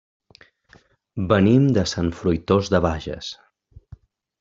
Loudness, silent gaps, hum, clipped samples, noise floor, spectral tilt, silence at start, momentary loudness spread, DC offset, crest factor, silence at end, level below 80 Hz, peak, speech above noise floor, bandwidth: -20 LUFS; none; none; under 0.1%; -55 dBFS; -6.5 dB/octave; 1.15 s; 18 LU; under 0.1%; 18 dB; 1.1 s; -46 dBFS; -4 dBFS; 36 dB; 7.8 kHz